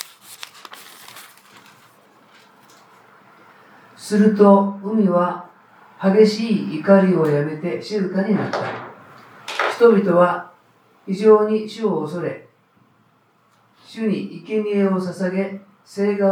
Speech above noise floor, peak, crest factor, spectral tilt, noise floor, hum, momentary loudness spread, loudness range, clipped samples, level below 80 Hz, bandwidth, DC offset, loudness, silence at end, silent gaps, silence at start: 42 dB; -2 dBFS; 18 dB; -7 dB/octave; -59 dBFS; none; 23 LU; 8 LU; under 0.1%; -78 dBFS; 15 kHz; under 0.1%; -18 LUFS; 0 s; none; 0.3 s